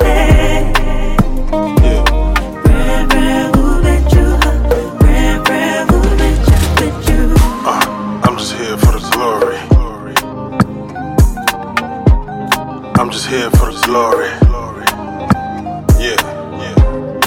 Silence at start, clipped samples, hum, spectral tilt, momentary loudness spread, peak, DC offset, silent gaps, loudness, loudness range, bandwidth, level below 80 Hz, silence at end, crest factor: 0 s; under 0.1%; none; -5.5 dB/octave; 6 LU; 0 dBFS; under 0.1%; none; -13 LUFS; 3 LU; 17 kHz; -14 dBFS; 0 s; 12 dB